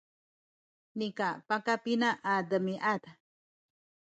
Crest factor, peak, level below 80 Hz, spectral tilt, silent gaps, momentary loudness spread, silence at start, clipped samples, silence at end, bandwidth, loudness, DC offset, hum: 20 dB; -14 dBFS; -82 dBFS; -5.5 dB/octave; none; 8 LU; 0.95 s; under 0.1%; 1.05 s; 9 kHz; -32 LUFS; under 0.1%; none